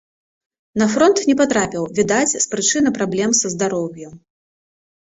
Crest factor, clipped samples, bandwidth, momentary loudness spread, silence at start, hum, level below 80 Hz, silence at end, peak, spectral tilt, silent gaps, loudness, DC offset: 16 dB; under 0.1%; 8.4 kHz; 9 LU; 0.75 s; none; -56 dBFS; 0.95 s; -2 dBFS; -3.5 dB/octave; none; -17 LUFS; under 0.1%